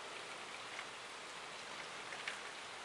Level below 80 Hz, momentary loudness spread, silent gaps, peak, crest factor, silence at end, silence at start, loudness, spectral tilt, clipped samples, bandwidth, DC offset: -82 dBFS; 4 LU; none; -28 dBFS; 22 dB; 0 s; 0 s; -47 LUFS; -0.5 dB/octave; under 0.1%; 12 kHz; under 0.1%